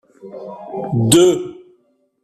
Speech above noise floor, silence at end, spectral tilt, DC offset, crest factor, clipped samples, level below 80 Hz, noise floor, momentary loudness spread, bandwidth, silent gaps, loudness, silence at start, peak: 44 dB; 0.7 s; -5 dB/octave; under 0.1%; 18 dB; under 0.1%; -52 dBFS; -60 dBFS; 22 LU; 14.5 kHz; none; -15 LUFS; 0.25 s; 0 dBFS